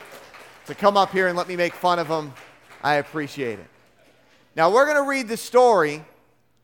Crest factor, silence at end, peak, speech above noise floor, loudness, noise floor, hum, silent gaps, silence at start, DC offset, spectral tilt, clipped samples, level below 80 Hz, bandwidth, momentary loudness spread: 20 dB; 0.6 s; -2 dBFS; 40 dB; -21 LUFS; -61 dBFS; none; none; 0 s; under 0.1%; -4.5 dB/octave; under 0.1%; -68 dBFS; 17.5 kHz; 19 LU